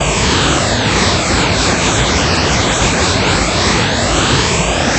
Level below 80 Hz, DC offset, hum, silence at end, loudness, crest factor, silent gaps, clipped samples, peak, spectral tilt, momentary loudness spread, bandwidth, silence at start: -24 dBFS; under 0.1%; none; 0 s; -12 LUFS; 12 dB; none; under 0.1%; 0 dBFS; -3.5 dB/octave; 1 LU; 8.6 kHz; 0 s